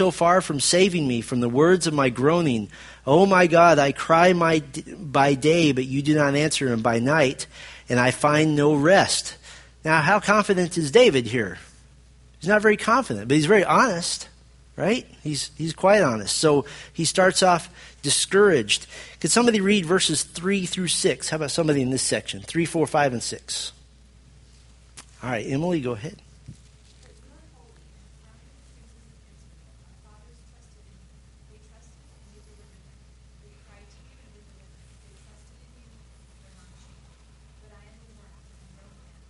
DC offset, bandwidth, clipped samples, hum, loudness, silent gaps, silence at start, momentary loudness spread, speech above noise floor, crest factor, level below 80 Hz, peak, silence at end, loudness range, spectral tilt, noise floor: under 0.1%; 11.5 kHz; under 0.1%; none; -21 LUFS; none; 0 s; 14 LU; 31 dB; 22 dB; -52 dBFS; -2 dBFS; 12.75 s; 12 LU; -4 dB/octave; -52 dBFS